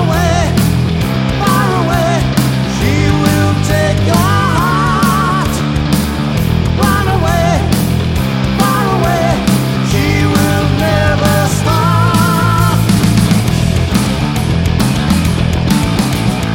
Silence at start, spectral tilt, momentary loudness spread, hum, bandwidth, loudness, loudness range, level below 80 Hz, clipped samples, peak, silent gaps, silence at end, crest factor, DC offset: 0 s; -5.5 dB/octave; 3 LU; none; 17 kHz; -12 LUFS; 2 LU; -24 dBFS; under 0.1%; 0 dBFS; none; 0 s; 12 dB; under 0.1%